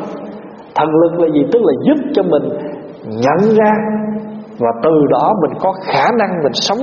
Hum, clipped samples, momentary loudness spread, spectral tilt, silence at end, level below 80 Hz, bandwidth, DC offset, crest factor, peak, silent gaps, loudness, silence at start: none; under 0.1%; 15 LU; -4.5 dB/octave; 0 s; -54 dBFS; 7 kHz; under 0.1%; 12 dB; 0 dBFS; none; -14 LUFS; 0 s